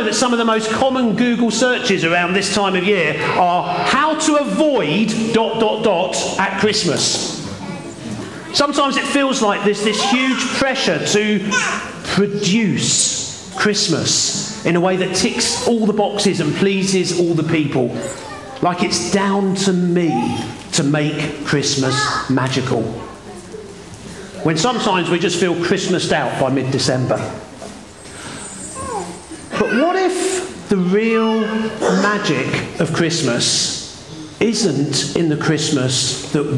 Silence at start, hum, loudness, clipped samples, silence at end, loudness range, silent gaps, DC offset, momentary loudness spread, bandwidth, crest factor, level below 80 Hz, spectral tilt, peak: 0 s; none; -17 LUFS; under 0.1%; 0 s; 4 LU; none; 0.2%; 13 LU; 12 kHz; 14 dB; -52 dBFS; -4 dB/octave; -4 dBFS